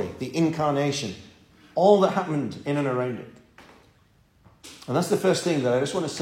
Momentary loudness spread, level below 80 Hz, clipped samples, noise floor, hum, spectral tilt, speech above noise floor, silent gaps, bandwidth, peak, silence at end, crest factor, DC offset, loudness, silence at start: 15 LU; -62 dBFS; under 0.1%; -60 dBFS; none; -5.5 dB/octave; 37 dB; none; 16.5 kHz; -4 dBFS; 0 s; 22 dB; under 0.1%; -24 LUFS; 0 s